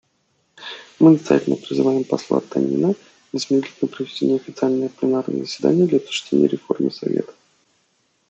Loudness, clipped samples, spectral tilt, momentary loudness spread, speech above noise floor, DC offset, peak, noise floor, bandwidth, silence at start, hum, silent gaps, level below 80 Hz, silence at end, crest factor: -20 LUFS; under 0.1%; -6.5 dB/octave; 12 LU; 47 dB; under 0.1%; -2 dBFS; -66 dBFS; 8.2 kHz; 0.6 s; none; none; -68 dBFS; 1 s; 18 dB